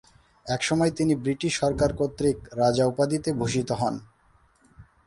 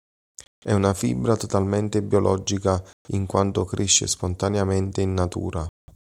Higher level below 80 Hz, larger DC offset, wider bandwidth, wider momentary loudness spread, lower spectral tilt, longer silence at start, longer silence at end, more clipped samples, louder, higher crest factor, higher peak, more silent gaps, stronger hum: about the same, -48 dBFS vs -48 dBFS; neither; second, 11.5 kHz vs 14 kHz; second, 5 LU vs 10 LU; about the same, -5.5 dB/octave vs -5 dB/octave; second, 0.45 s vs 0.65 s; second, 0.25 s vs 0.4 s; neither; about the same, -25 LUFS vs -23 LUFS; about the same, 16 dB vs 20 dB; second, -10 dBFS vs -4 dBFS; second, none vs 2.93-3.05 s; neither